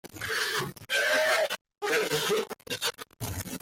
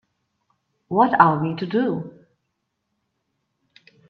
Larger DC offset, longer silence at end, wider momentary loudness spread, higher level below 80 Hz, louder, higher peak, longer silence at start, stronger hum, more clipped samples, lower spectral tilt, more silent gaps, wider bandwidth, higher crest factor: neither; second, 0.05 s vs 2 s; about the same, 11 LU vs 13 LU; first, -60 dBFS vs -66 dBFS; second, -28 LUFS vs -20 LUFS; second, -14 dBFS vs 0 dBFS; second, 0.05 s vs 0.9 s; neither; neither; second, -2 dB/octave vs -9.5 dB/octave; first, 1.61-1.65 s vs none; first, 17 kHz vs 5.6 kHz; second, 16 dB vs 24 dB